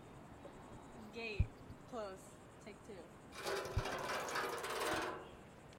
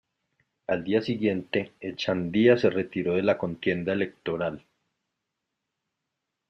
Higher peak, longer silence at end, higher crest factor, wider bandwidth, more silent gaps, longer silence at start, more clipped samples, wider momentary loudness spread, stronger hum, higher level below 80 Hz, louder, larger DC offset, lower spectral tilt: second, -22 dBFS vs -6 dBFS; second, 0 s vs 1.9 s; about the same, 24 dB vs 22 dB; first, 16.5 kHz vs 6.8 kHz; neither; second, 0 s vs 0.7 s; neither; first, 16 LU vs 10 LU; neither; first, -54 dBFS vs -66 dBFS; second, -43 LUFS vs -26 LUFS; neither; second, -4 dB/octave vs -7 dB/octave